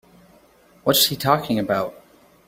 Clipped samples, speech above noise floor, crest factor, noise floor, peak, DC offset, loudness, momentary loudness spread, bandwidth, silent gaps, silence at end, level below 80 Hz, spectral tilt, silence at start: under 0.1%; 34 dB; 22 dB; -54 dBFS; -2 dBFS; under 0.1%; -20 LUFS; 9 LU; 16.5 kHz; none; 0.55 s; -58 dBFS; -3.5 dB/octave; 0.85 s